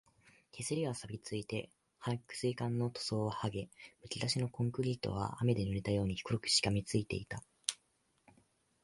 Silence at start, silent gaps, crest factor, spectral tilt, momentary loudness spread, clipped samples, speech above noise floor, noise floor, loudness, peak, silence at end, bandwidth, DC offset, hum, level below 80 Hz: 0.55 s; none; 26 dB; -4.5 dB/octave; 12 LU; under 0.1%; 40 dB; -77 dBFS; -37 LUFS; -12 dBFS; 1.1 s; 11.5 kHz; under 0.1%; none; -60 dBFS